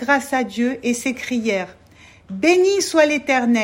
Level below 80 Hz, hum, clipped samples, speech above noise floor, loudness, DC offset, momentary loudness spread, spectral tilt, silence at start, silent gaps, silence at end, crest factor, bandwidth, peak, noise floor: -58 dBFS; none; under 0.1%; 29 dB; -18 LUFS; under 0.1%; 7 LU; -3.5 dB/octave; 0 s; none; 0 s; 18 dB; 16.5 kHz; -2 dBFS; -47 dBFS